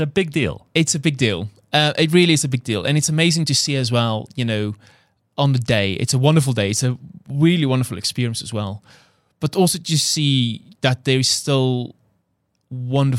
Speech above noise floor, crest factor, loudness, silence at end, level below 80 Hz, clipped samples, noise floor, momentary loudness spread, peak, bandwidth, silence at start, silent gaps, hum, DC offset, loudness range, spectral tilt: 51 dB; 18 dB; -19 LUFS; 0 s; -54 dBFS; under 0.1%; -69 dBFS; 11 LU; -2 dBFS; 15.5 kHz; 0 s; none; none; under 0.1%; 3 LU; -4.5 dB/octave